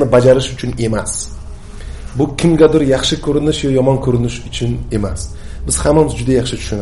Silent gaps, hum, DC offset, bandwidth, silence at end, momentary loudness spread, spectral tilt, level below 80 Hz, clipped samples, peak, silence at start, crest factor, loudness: none; none; 0.6%; 11.5 kHz; 0 s; 17 LU; -5.5 dB/octave; -28 dBFS; under 0.1%; 0 dBFS; 0 s; 14 dB; -14 LUFS